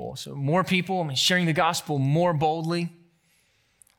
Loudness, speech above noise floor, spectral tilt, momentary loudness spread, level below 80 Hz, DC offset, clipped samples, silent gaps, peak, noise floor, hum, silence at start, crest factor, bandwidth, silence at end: -24 LUFS; 42 dB; -4.5 dB/octave; 9 LU; -64 dBFS; under 0.1%; under 0.1%; none; -8 dBFS; -66 dBFS; none; 0 s; 18 dB; 18.5 kHz; 1.1 s